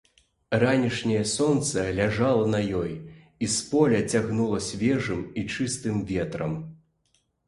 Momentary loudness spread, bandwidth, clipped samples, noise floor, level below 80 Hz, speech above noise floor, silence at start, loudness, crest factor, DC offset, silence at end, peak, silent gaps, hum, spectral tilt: 9 LU; 11.5 kHz; under 0.1%; -70 dBFS; -50 dBFS; 45 dB; 0.5 s; -25 LUFS; 18 dB; under 0.1%; 0.75 s; -6 dBFS; none; none; -5 dB/octave